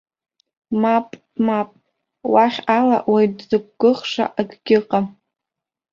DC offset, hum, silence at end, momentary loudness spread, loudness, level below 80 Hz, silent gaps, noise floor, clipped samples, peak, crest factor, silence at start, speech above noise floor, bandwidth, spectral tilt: under 0.1%; none; 0.85 s; 10 LU; -19 LUFS; -64 dBFS; none; -86 dBFS; under 0.1%; -2 dBFS; 18 dB; 0.7 s; 68 dB; 7.4 kHz; -6.5 dB/octave